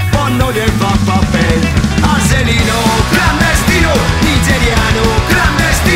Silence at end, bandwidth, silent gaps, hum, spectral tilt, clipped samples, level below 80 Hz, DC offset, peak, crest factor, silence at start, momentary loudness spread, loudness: 0 s; 16 kHz; none; none; -4.5 dB/octave; under 0.1%; -18 dBFS; under 0.1%; 0 dBFS; 10 dB; 0 s; 2 LU; -11 LUFS